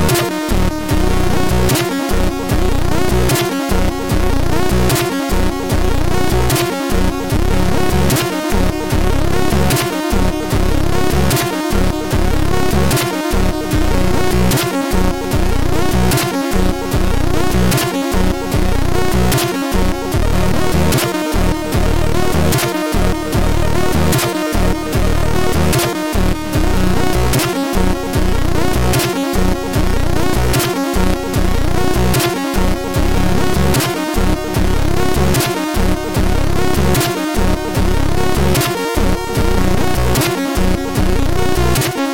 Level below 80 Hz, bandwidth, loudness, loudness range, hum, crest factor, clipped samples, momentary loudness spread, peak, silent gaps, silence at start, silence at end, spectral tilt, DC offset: -20 dBFS; 17 kHz; -16 LUFS; 0 LU; none; 12 dB; under 0.1%; 3 LU; -4 dBFS; none; 0 s; 0 s; -5 dB/octave; 8%